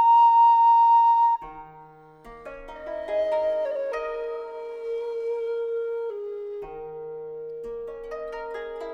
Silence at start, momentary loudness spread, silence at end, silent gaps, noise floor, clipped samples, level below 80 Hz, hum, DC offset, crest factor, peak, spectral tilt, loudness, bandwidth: 0 s; 21 LU; 0 s; none; -49 dBFS; under 0.1%; -58 dBFS; none; under 0.1%; 12 dB; -12 dBFS; -4.5 dB/octave; -22 LUFS; 6 kHz